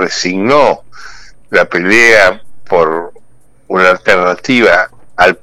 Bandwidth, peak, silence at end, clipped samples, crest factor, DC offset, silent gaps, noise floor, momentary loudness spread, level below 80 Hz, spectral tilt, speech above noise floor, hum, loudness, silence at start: 17 kHz; 0 dBFS; 0.05 s; 0.8%; 10 dB; under 0.1%; none; -45 dBFS; 13 LU; -44 dBFS; -4 dB/octave; 36 dB; none; -9 LUFS; 0 s